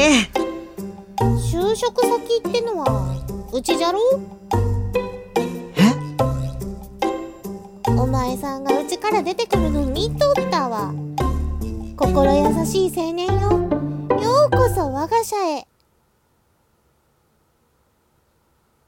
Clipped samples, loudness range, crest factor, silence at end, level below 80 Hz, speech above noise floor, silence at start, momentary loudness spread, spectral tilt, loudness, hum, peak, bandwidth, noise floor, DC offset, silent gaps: under 0.1%; 4 LU; 18 dB; 3.25 s; -32 dBFS; 44 dB; 0 s; 11 LU; -5.5 dB/octave; -20 LUFS; none; -2 dBFS; 17 kHz; -63 dBFS; under 0.1%; none